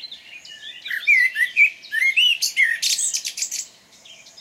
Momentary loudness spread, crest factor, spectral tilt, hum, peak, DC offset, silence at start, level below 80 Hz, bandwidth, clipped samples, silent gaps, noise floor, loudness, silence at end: 21 LU; 16 dB; 5 dB/octave; none; -6 dBFS; under 0.1%; 0 s; -76 dBFS; 16 kHz; under 0.1%; none; -47 dBFS; -17 LUFS; 0.1 s